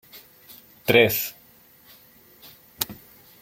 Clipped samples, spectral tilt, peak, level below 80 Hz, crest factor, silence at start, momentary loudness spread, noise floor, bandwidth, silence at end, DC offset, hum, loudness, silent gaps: under 0.1%; -3.5 dB/octave; -2 dBFS; -60 dBFS; 26 dB; 0.15 s; 28 LU; -54 dBFS; 16.5 kHz; 0.45 s; under 0.1%; none; -22 LUFS; none